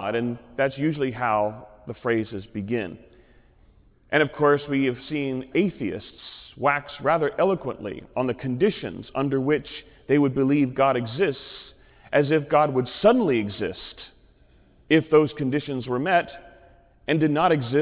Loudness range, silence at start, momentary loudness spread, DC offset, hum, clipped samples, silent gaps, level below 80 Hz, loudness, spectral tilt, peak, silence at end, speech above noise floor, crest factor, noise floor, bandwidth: 4 LU; 0 s; 16 LU; under 0.1%; none; under 0.1%; none; -56 dBFS; -24 LUFS; -10.5 dB/octave; -6 dBFS; 0 s; 33 dB; 18 dB; -56 dBFS; 4 kHz